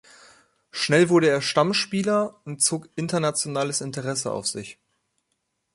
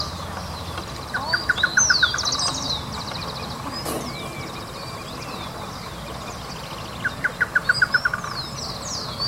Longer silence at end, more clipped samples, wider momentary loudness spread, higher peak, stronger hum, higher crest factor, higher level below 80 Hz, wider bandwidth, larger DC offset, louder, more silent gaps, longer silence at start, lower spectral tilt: first, 1 s vs 0 s; neither; second, 11 LU vs 14 LU; about the same, -4 dBFS vs -6 dBFS; neither; about the same, 20 dB vs 20 dB; second, -66 dBFS vs -44 dBFS; second, 11.5 kHz vs 16 kHz; neither; about the same, -23 LUFS vs -24 LUFS; neither; first, 0.75 s vs 0 s; first, -4 dB/octave vs -1.5 dB/octave